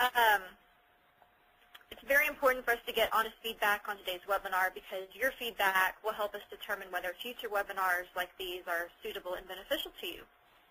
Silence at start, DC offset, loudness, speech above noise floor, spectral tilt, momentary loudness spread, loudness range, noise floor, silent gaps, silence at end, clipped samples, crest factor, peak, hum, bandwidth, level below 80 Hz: 0 s; under 0.1%; -33 LUFS; 32 dB; -1 dB/octave; 14 LU; 5 LU; -67 dBFS; none; 0.45 s; under 0.1%; 20 dB; -14 dBFS; none; 15.5 kHz; -64 dBFS